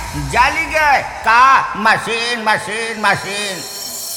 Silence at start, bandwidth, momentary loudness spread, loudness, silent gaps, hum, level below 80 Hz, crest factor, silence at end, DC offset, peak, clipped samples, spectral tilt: 0 s; 19 kHz; 11 LU; -14 LUFS; none; none; -38 dBFS; 14 dB; 0 s; under 0.1%; 0 dBFS; under 0.1%; -2.5 dB/octave